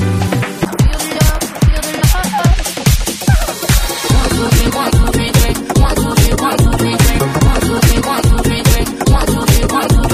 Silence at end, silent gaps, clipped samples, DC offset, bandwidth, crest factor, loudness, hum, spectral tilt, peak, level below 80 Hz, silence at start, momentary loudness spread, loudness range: 0 s; none; under 0.1%; under 0.1%; 16 kHz; 12 dB; -13 LUFS; none; -5 dB/octave; 0 dBFS; -16 dBFS; 0 s; 2 LU; 2 LU